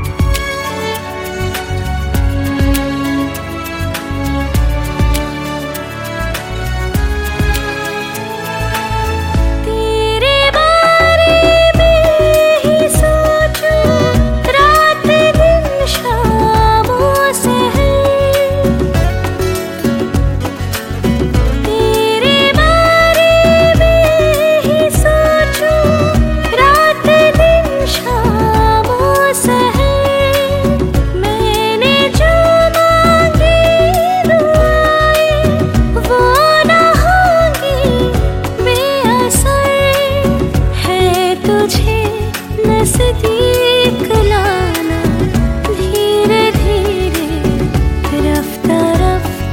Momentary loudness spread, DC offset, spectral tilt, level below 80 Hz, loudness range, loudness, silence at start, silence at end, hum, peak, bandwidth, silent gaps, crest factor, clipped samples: 10 LU; under 0.1%; -5 dB/octave; -20 dBFS; 7 LU; -11 LUFS; 0 s; 0 s; none; 0 dBFS; 17 kHz; none; 10 dB; under 0.1%